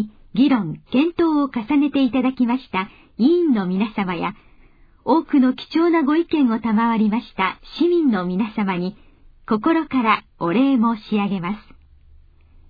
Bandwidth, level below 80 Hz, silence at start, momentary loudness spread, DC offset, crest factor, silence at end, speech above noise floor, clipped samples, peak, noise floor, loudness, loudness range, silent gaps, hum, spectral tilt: 5 kHz; -52 dBFS; 0 s; 8 LU; under 0.1%; 16 dB; 1.1 s; 31 dB; under 0.1%; -4 dBFS; -50 dBFS; -20 LUFS; 2 LU; none; none; -9 dB/octave